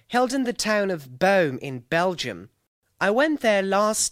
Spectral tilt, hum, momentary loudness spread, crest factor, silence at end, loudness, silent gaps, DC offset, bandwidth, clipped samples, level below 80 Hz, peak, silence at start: -3.5 dB/octave; none; 9 LU; 16 dB; 0 s; -23 LUFS; 2.67-2.82 s; under 0.1%; 16 kHz; under 0.1%; -60 dBFS; -6 dBFS; 0.1 s